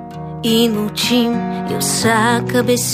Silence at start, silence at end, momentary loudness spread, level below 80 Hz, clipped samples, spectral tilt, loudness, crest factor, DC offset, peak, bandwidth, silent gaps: 0 s; 0 s; 7 LU; -46 dBFS; under 0.1%; -4 dB/octave; -16 LUFS; 14 dB; under 0.1%; -2 dBFS; 15.5 kHz; none